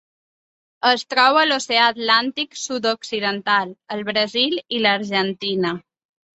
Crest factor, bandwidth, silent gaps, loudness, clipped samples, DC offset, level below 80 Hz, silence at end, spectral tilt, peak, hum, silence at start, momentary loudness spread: 20 dB; 8.2 kHz; none; -19 LUFS; under 0.1%; under 0.1%; -68 dBFS; 0.6 s; -3 dB/octave; -2 dBFS; none; 0.85 s; 10 LU